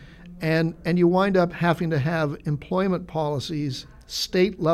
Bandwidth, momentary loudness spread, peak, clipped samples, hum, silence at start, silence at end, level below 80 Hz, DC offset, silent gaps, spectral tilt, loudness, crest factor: 14.5 kHz; 9 LU; -8 dBFS; under 0.1%; none; 0 s; 0 s; -50 dBFS; under 0.1%; none; -6.5 dB/octave; -24 LUFS; 16 dB